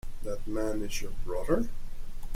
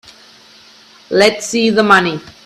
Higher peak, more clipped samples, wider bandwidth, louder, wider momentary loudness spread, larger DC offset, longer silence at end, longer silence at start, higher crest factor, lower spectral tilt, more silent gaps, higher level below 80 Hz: second, -12 dBFS vs 0 dBFS; neither; about the same, 14.5 kHz vs 14 kHz; second, -34 LUFS vs -12 LUFS; first, 17 LU vs 8 LU; neither; second, 0 s vs 0.15 s; second, 0.05 s vs 1.1 s; about the same, 16 dB vs 16 dB; first, -5.5 dB/octave vs -3.5 dB/octave; neither; first, -36 dBFS vs -56 dBFS